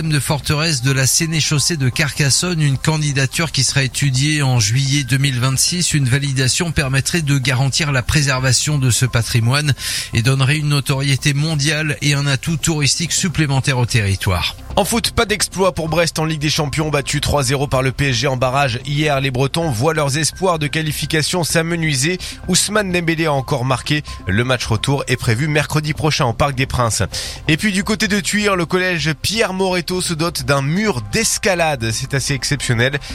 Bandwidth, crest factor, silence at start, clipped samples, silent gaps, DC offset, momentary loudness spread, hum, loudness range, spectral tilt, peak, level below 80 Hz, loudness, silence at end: 16 kHz; 16 dB; 0 s; under 0.1%; none; under 0.1%; 4 LU; none; 2 LU; -4 dB/octave; 0 dBFS; -36 dBFS; -16 LUFS; 0 s